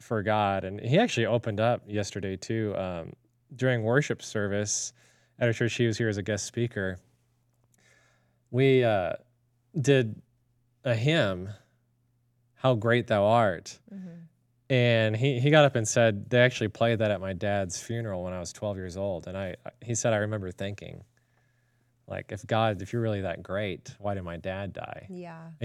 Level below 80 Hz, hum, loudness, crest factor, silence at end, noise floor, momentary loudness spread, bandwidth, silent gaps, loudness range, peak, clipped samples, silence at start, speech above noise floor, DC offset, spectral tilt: -68 dBFS; none; -28 LUFS; 24 dB; 0 s; -70 dBFS; 16 LU; 12.5 kHz; none; 8 LU; -4 dBFS; under 0.1%; 0 s; 43 dB; under 0.1%; -5 dB/octave